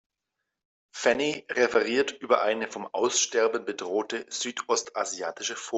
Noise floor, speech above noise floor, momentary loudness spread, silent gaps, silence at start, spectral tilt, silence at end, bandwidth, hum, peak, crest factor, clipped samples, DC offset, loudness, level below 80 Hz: -84 dBFS; 57 dB; 8 LU; none; 0.95 s; -1.5 dB/octave; 0 s; 8.4 kHz; none; -8 dBFS; 20 dB; under 0.1%; under 0.1%; -27 LUFS; -72 dBFS